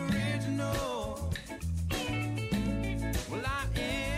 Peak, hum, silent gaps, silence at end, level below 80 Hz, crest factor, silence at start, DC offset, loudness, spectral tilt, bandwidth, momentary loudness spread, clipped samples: -20 dBFS; none; none; 0 s; -40 dBFS; 12 dB; 0 s; under 0.1%; -33 LUFS; -5.5 dB/octave; 16 kHz; 4 LU; under 0.1%